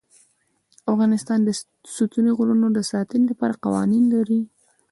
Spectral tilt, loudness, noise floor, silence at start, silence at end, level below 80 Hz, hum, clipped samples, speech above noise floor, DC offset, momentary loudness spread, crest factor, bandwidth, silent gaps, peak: -6 dB/octave; -21 LUFS; -65 dBFS; 0.85 s; 0.45 s; -64 dBFS; none; under 0.1%; 45 dB; under 0.1%; 8 LU; 14 dB; 11.5 kHz; none; -8 dBFS